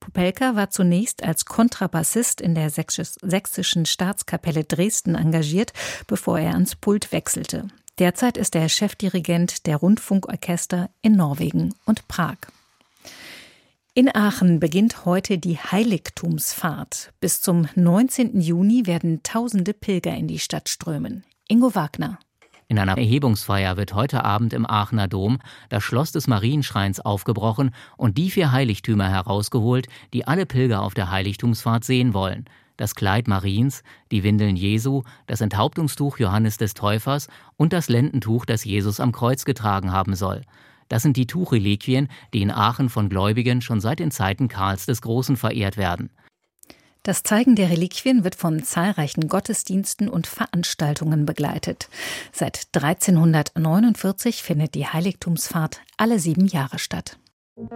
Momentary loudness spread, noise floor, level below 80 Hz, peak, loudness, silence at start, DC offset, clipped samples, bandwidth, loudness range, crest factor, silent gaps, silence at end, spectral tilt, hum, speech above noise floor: 8 LU; -59 dBFS; -54 dBFS; -2 dBFS; -21 LUFS; 0 s; under 0.1%; under 0.1%; 16.5 kHz; 3 LU; 20 dB; 57.33-57.56 s; 0 s; -5.5 dB/octave; none; 38 dB